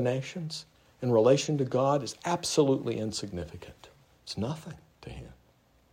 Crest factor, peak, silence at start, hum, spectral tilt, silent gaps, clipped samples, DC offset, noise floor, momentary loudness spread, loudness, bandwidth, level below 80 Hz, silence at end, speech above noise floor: 20 dB; -10 dBFS; 0 s; none; -5.5 dB/octave; none; under 0.1%; under 0.1%; -64 dBFS; 23 LU; -29 LUFS; 16 kHz; -60 dBFS; 0.6 s; 35 dB